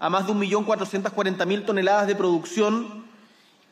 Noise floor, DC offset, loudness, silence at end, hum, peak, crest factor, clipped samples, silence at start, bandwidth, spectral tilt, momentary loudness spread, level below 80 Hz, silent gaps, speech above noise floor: -56 dBFS; under 0.1%; -23 LUFS; 0.65 s; none; -8 dBFS; 16 dB; under 0.1%; 0 s; 14 kHz; -5 dB/octave; 6 LU; -78 dBFS; none; 33 dB